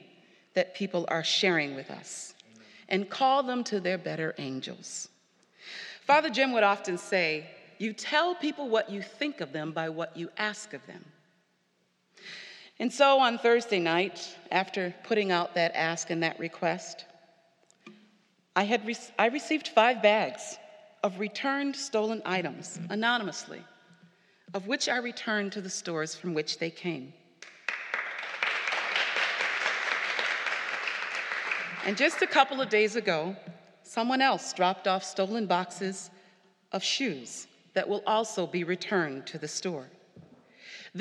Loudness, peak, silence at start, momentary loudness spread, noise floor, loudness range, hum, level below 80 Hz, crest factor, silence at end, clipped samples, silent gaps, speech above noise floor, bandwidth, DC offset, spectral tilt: -29 LUFS; -6 dBFS; 0.55 s; 16 LU; -72 dBFS; 6 LU; none; -90 dBFS; 24 dB; 0 s; under 0.1%; none; 43 dB; 12 kHz; under 0.1%; -3.5 dB/octave